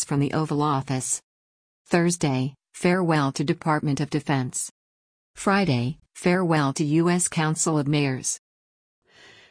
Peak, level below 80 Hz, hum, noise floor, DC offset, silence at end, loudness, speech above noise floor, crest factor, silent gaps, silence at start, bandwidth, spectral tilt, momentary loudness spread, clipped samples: -8 dBFS; -58 dBFS; none; under -90 dBFS; under 0.1%; 1.15 s; -24 LUFS; over 67 dB; 16 dB; 1.23-1.85 s, 4.71-5.34 s; 0 s; 10.5 kHz; -5 dB/octave; 7 LU; under 0.1%